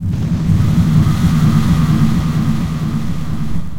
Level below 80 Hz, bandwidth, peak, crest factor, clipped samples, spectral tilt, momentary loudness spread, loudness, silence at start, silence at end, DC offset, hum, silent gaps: -26 dBFS; 16.5 kHz; 0 dBFS; 14 dB; under 0.1%; -7.5 dB/octave; 9 LU; -15 LUFS; 0 s; 0 s; 5%; none; none